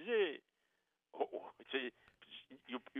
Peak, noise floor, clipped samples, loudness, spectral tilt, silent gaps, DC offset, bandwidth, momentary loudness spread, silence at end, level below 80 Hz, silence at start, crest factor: -24 dBFS; -84 dBFS; under 0.1%; -42 LUFS; -5.5 dB/octave; none; under 0.1%; 3.9 kHz; 19 LU; 0 s; -90 dBFS; 0 s; 20 dB